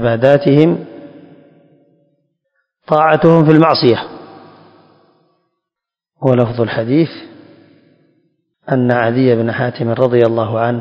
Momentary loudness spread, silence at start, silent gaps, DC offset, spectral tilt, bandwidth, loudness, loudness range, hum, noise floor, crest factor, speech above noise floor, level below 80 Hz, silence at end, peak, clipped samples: 11 LU; 0 s; none; under 0.1%; -9 dB/octave; 7.2 kHz; -13 LUFS; 5 LU; none; -83 dBFS; 14 dB; 72 dB; -52 dBFS; 0 s; 0 dBFS; 0.3%